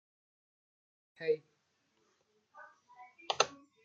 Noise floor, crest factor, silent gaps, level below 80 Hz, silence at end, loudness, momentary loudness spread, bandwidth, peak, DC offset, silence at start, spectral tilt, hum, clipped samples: -78 dBFS; 34 dB; none; under -90 dBFS; 0.3 s; -36 LUFS; 24 LU; 8.8 kHz; -8 dBFS; under 0.1%; 1.2 s; -1 dB/octave; none; under 0.1%